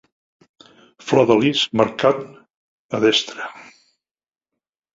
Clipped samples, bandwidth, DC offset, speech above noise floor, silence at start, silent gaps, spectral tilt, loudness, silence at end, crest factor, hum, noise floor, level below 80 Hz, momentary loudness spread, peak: under 0.1%; 7.8 kHz; under 0.1%; over 72 dB; 1.05 s; 2.56-2.89 s; -4.5 dB/octave; -18 LUFS; 1.3 s; 20 dB; none; under -90 dBFS; -60 dBFS; 17 LU; -2 dBFS